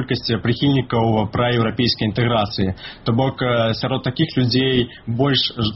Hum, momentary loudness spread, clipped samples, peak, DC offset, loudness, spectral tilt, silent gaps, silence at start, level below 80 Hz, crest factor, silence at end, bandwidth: none; 5 LU; under 0.1%; -4 dBFS; under 0.1%; -19 LUFS; -4.5 dB/octave; none; 0 s; -44 dBFS; 14 dB; 0 s; 6 kHz